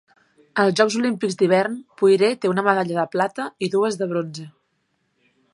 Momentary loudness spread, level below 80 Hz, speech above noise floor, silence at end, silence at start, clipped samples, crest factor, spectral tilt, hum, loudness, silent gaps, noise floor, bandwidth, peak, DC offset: 9 LU; -72 dBFS; 50 dB; 1.05 s; 0.55 s; under 0.1%; 20 dB; -5 dB/octave; none; -20 LUFS; none; -70 dBFS; 11.5 kHz; -2 dBFS; under 0.1%